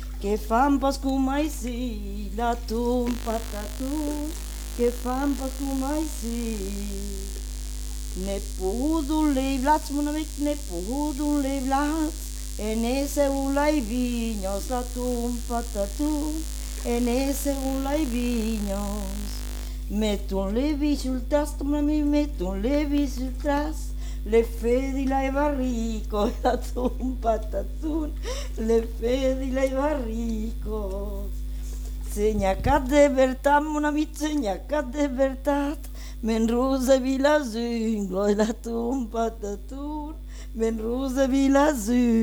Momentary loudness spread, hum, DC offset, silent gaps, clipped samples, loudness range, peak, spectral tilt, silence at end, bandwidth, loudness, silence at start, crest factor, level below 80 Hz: 12 LU; 50 Hz at -30 dBFS; under 0.1%; none; under 0.1%; 5 LU; -8 dBFS; -5.5 dB/octave; 0 s; 19 kHz; -26 LUFS; 0 s; 18 dB; -32 dBFS